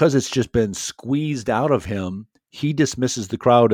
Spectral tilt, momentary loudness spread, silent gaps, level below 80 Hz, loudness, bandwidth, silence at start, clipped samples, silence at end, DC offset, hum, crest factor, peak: -5.5 dB/octave; 10 LU; none; -48 dBFS; -21 LUFS; 18 kHz; 0 s; under 0.1%; 0 s; under 0.1%; none; 18 dB; -2 dBFS